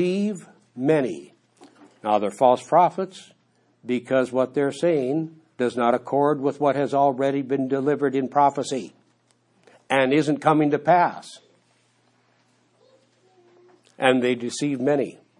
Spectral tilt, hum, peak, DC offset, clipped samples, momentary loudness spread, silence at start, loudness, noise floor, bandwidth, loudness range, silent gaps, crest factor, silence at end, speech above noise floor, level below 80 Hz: -6 dB/octave; none; -2 dBFS; under 0.1%; under 0.1%; 12 LU; 0 s; -22 LUFS; -64 dBFS; 11.5 kHz; 5 LU; none; 22 dB; 0.25 s; 43 dB; -78 dBFS